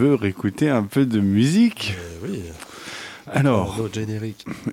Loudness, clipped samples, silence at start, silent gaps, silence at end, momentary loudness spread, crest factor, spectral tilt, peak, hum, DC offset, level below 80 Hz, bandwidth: -21 LUFS; under 0.1%; 0 s; none; 0 s; 16 LU; 16 dB; -6.5 dB/octave; -6 dBFS; none; under 0.1%; -50 dBFS; 16 kHz